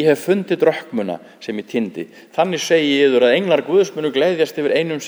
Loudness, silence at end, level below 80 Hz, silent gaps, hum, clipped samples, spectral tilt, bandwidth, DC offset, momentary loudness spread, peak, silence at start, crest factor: -17 LUFS; 0 s; -72 dBFS; none; none; under 0.1%; -5 dB/octave; over 20 kHz; under 0.1%; 13 LU; -2 dBFS; 0 s; 16 dB